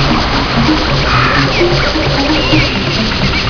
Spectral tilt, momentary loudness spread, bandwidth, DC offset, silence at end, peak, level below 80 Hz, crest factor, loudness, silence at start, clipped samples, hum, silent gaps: -5 dB/octave; 2 LU; 5.4 kHz; under 0.1%; 0 s; 0 dBFS; -20 dBFS; 12 dB; -11 LUFS; 0 s; under 0.1%; none; none